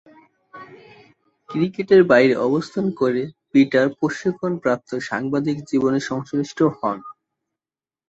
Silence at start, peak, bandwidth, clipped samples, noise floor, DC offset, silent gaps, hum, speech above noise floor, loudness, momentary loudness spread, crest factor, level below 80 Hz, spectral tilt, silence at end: 0.55 s; -2 dBFS; 8 kHz; under 0.1%; under -90 dBFS; under 0.1%; none; none; over 71 dB; -20 LUFS; 11 LU; 18 dB; -62 dBFS; -6.5 dB/octave; 0.95 s